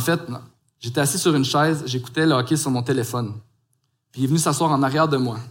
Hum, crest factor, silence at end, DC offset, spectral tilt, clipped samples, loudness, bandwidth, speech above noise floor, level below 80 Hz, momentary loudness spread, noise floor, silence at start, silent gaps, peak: none; 16 dB; 0 s; under 0.1%; -5 dB/octave; under 0.1%; -21 LUFS; 17 kHz; 49 dB; -64 dBFS; 14 LU; -70 dBFS; 0 s; none; -6 dBFS